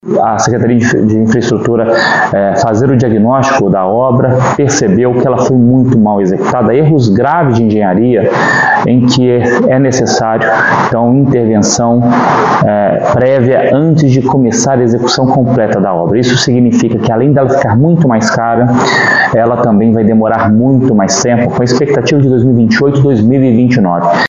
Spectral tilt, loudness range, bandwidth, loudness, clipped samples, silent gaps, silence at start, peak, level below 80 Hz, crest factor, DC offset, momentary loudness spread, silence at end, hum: -6 dB/octave; 1 LU; 7.8 kHz; -9 LUFS; under 0.1%; none; 0.05 s; 0 dBFS; -40 dBFS; 8 dB; 0.4%; 2 LU; 0 s; none